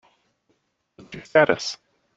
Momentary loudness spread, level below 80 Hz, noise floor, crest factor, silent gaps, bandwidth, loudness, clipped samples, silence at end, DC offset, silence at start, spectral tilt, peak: 23 LU; -64 dBFS; -70 dBFS; 24 dB; none; 8 kHz; -21 LUFS; under 0.1%; 0.4 s; under 0.1%; 1.1 s; -4 dB/octave; -2 dBFS